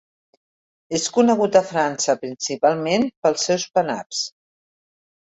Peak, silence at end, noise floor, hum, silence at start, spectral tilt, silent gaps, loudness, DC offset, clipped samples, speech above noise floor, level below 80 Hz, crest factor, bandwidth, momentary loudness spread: -2 dBFS; 0.95 s; under -90 dBFS; none; 0.9 s; -3.5 dB/octave; 3.17-3.22 s, 4.06-4.10 s; -20 LUFS; under 0.1%; under 0.1%; over 70 dB; -66 dBFS; 20 dB; 8.4 kHz; 9 LU